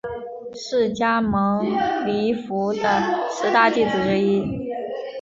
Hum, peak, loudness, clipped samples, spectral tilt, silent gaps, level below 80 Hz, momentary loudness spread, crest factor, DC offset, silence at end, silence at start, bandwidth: none; -2 dBFS; -21 LUFS; under 0.1%; -5.5 dB/octave; none; -52 dBFS; 12 LU; 18 dB; under 0.1%; 0 s; 0.05 s; 7.6 kHz